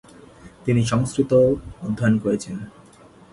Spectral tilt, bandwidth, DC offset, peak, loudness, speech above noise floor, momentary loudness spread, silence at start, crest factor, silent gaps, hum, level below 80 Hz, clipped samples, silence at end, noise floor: -7 dB/octave; 11.5 kHz; under 0.1%; -6 dBFS; -21 LUFS; 28 dB; 15 LU; 0.45 s; 16 dB; none; none; -48 dBFS; under 0.1%; 0.65 s; -48 dBFS